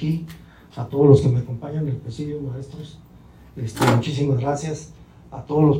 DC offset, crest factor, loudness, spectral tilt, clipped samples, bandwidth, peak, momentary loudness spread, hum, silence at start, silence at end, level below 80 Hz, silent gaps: under 0.1%; 20 dB; -21 LUFS; -7.5 dB/octave; under 0.1%; 16 kHz; -2 dBFS; 23 LU; none; 0 s; 0 s; -46 dBFS; none